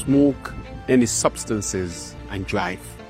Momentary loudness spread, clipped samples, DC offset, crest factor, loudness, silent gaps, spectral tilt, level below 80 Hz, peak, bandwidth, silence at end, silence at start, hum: 14 LU; under 0.1%; under 0.1%; 20 dB; -22 LUFS; none; -4.5 dB/octave; -42 dBFS; -4 dBFS; 15.5 kHz; 0 s; 0 s; none